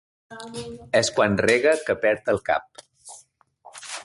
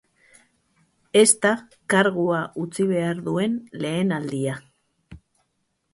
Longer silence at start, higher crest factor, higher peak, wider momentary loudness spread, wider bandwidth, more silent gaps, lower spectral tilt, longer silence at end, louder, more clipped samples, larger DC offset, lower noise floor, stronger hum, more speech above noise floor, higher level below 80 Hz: second, 0.3 s vs 1.15 s; about the same, 20 dB vs 22 dB; about the same, -4 dBFS vs -2 dBFS; first, 22 LU vs 12 LU; about the same, 11.5 kHz vs 11.5 kHz; neither; about the same, -4 dB/octave vs -4 dB/octave; second, 0 s vs 0.75 s; about the same, -22 LUFS vs -22 LUFS; neither; neither; second, -55 dBFS vs -73 dBFS; neither; second, 33 dB vs 51 dB; first, -56 dBFS vs -62 dBFS